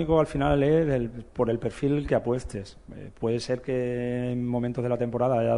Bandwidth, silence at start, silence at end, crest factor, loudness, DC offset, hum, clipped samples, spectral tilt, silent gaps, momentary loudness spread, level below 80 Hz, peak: 11 kHz; 0 s; 0 s; 18 dB; -27 LUFS; under 0.1%; none; under 0.1%; -7.5 dB/octave; none; 11 LU; -44 dBFS; -8 dBFS